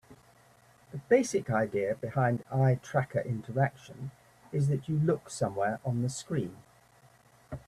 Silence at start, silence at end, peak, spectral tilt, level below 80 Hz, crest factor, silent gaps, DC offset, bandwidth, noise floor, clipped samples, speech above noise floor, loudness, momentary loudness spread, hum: 0.1 s; 0.1 s; -12 dBFS; -7 dB/octave; -64 dBFS; 20 dB; none; under 0.1%; 13 kHz; -61 dBFS; under 0.1%; 31 dB; -30 LUFS; 17 LU; none